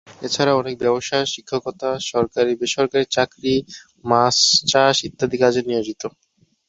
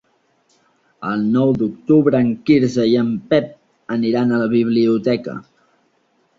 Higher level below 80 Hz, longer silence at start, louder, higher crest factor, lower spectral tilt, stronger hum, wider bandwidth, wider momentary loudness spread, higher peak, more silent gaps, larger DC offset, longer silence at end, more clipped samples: about the same, -54 dBFS vs -56 dBFS; second, 0.1 s vs 1 s; about the same, -19 LUFS vs -17 LUFS; about the same, 18 dB vs 16 dB; second, -3 dB/octave vs -7.5 dB/octave; neither; first, 8.2 kHz vs 7.4 kHz; about the same, 12 LU vs 10 LU; about the same, -2 dBFS vs -2 dBFS; neither; neither; second, 0.6 s vs 0.95 s; neither